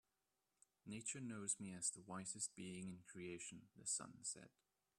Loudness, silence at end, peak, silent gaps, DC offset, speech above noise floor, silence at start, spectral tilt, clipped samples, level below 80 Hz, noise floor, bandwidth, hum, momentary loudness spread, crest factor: -49 LUFS; 0.5 s; -26 dBFS; none; under 0.1%; 39 dB; 0.85 s; -3 dB/octave; under 0.1%; -86 dBFS; -90 dBFS; 13.5 kHz; none; 10 LU; 26 dB